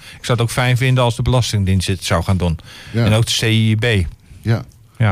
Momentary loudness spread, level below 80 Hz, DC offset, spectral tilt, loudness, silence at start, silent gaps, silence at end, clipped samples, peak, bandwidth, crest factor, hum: 8 LU; -34 dBFS; under 0.1%; -5.5 dB/octave; -17 LUFS; 0 s; none; 0 s; under 0.1%; -4 dBFS; 15.5 kHz; 12 dB; none